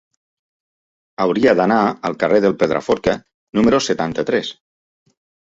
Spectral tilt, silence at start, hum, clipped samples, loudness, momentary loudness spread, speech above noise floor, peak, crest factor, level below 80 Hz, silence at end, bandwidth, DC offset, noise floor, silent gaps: -5.5 dB/octave; 1.2 s; none; under 0.1%; -17 LUFS; 7 LU; over 74 dB; -2 dBFS; 18 dB; -50 dBFS; 0.9 s; 7.8 kHz; under 0.1%; under -90 dBFS; 3.34-3.53 s